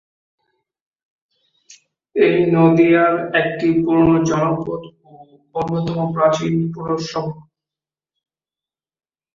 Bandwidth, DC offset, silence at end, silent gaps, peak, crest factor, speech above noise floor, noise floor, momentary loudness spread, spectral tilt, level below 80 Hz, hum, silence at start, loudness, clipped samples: 7.4 kHz; under 0.1%; 1.95 s; none; -2 dBFS; 16 dB; over 74 dB; under -90 dBFS; 13 LU; -7 dB/octave; -52 dBFS; none; 2.15 s; -17 LUFS; under 0.1%